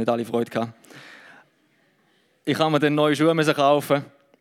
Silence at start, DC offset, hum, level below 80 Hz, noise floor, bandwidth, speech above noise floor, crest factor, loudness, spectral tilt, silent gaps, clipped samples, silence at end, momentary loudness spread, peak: 0 s; under 0.1%; none; -78 dBFS; -64 dBFS; 16 kHz; 42 dB; 20 dB; -22 LUFS; -5.5 dB/octave; none; under 0.1%; 0.35 s; 12 LU; -4 dBFS